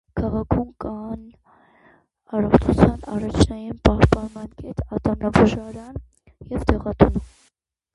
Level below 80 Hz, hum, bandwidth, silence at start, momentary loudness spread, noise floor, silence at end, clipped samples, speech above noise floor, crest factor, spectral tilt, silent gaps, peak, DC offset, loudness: -32 dBFS; none; 11.5 kHz; 0.15 s; 17 LU; -66 dBFS; 0.7 s; under 0.1%; 46 dB; 22 dB; -7.5 dB/octave; none; 0 dBFS; under 0.1%; -21 LUFS